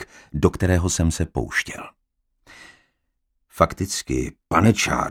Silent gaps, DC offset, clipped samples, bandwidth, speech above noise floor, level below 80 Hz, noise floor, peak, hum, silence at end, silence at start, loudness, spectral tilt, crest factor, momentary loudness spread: none; under 0.1%; under 0.1%; 16.5 kHz; 52 dB; -36 dBFS; -73 dBFS; 0 dBFS; none; 0 s; 0 s; -22 LUFS; -5 dB/octave; 22 dB; 13 LU